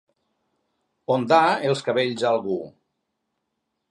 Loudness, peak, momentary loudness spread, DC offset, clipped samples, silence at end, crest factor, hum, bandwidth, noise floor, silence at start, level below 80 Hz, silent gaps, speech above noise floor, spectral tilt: -22 LUFS; -4 dBFS; 14 LU; under 0.1%; under 0.1%; 1.2 s; 20 dB; none; 11.5 kHz; -78 dBFS; 1.1 s; -72 dBFS; none; 57 dB; -5.5 dB/octave